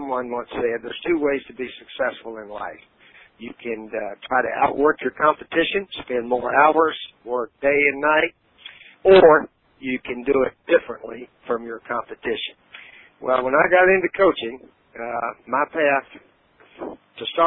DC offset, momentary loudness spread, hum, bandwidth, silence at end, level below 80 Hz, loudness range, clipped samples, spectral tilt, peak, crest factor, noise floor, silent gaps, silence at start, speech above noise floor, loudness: under 0.1%; 19 LU; none; 4.2 kHz; 0 s; -56 dBFS; 8 LU; under 0.1%; -9.5 dB/octave; -2 dBFS; 20 dB; -45 dBFS; none; 0 s; 24 dB; -20 LUFS